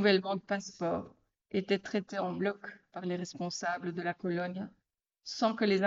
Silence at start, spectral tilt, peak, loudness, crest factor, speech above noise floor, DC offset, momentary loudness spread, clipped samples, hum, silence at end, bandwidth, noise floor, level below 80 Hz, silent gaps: 0 s; -4 dB/octave; -14 dBFS; -35 LUFS; 20 dB; 35 dB; under 0.1%; 13 LU; under 0.1%; none; 0 s; 7.8 kHz; -68 dBFS; -74 dBFS; none